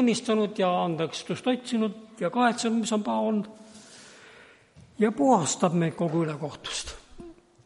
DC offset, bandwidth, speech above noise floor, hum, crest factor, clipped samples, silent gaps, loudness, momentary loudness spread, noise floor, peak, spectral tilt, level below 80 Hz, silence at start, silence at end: under 0.1%; 11.5 kHz; 28 dB; none; 18 dB; under 0.1%; none; -27 LUFS; 18 LU; -54 dBFS; -8 dBFS; -5 dB/octave; -60 dBFS; 0 s; 0.35 s